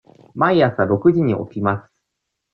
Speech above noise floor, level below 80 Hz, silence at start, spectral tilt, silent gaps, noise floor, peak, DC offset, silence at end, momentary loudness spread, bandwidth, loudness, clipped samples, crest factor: 61 dB; -56 dBFS; 0.35 s; -10 dB/octave; none; -78 dBFS; -2 dBFS; under 0.1%; 0.75 s; 9 LU; 5 kHz; -18 LUFS; under 0.1%; 16 dB